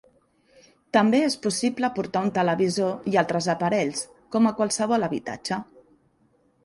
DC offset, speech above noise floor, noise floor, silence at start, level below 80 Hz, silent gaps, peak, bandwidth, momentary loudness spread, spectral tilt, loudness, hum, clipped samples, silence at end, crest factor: under 0.1%; 41 dB; -64 dBFS; 0.95 s; -66 dBFS; none; -6 dBFS; 11.5 kHz; 9 LU; -4.5 dB/octave; -24 LUFS; none; under 0.1%; 1 s; 18 dB